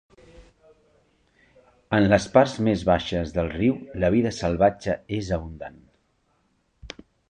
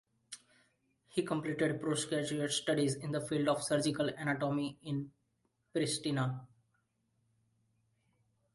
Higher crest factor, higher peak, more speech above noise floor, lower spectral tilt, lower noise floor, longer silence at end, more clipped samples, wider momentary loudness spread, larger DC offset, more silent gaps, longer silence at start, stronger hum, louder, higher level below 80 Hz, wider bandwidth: about the same, 22 dB vs 18 dB; first, -4 dBFS vs -18 dBFS; about the same, 46 dB vs 45 dB; first, -6.5 dB/octave vs -4.5 dB/octave; second, -68 dBFS vs -79 dBFS; second, 0.4 s vs 2.1 s; neither; first, 20 LU vs 11 LU; neither; neither; about the same, 0.4 s vs 0.3 s; neither; first, -23 LUFS vs -35 LUFS; first, -44 dBFS vs -74 dBFS; second, 9.8 kHz vs 11.5 kHz